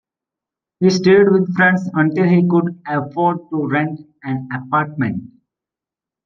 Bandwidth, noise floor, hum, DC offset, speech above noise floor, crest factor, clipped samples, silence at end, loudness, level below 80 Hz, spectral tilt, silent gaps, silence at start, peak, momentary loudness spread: 7.2 kHz; -88 dBFS; none; under 0.1%; 72 dB; 16 dB; under 0.1%; 1 s; -16 LUFS; -62 dBFS; -7 dB/octave; none; 0.8 s; -2 dBFS; 13 LU